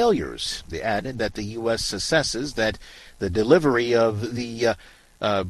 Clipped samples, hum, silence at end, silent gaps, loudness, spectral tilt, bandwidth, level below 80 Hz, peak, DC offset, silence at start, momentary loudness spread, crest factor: under 0.1%; none; 0 s; none; -23 LUFS; -4.5 dB/octave; 12.5 kHz; -46 dBFS; -4 dBFS; under 0.1%; 0 s; 10 LU; 20 dB